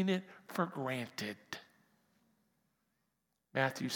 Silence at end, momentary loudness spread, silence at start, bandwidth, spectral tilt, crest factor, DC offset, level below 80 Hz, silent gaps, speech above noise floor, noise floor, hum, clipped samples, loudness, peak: 0 s; 12 LU; 0 s; 18 kHz; -5 dB/octave; 26 dB; under 0.1%; -88 dBFS; none; 46 dB; -84 dBFS; none; under 0.1%; -39 LUFS; -16 dBFS